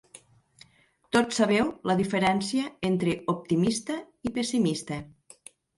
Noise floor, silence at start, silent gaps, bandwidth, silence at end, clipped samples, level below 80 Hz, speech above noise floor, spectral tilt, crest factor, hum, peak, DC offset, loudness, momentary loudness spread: -63 dBFS; 1.15 s; none; 11.5 kHz; 0.7 s; under 0.1%; -60 dBFS; 37 dB; -5 dB/octave; 22 dB; none; -6 dBFS; under 0.1%; -27 LUFS; 10 LU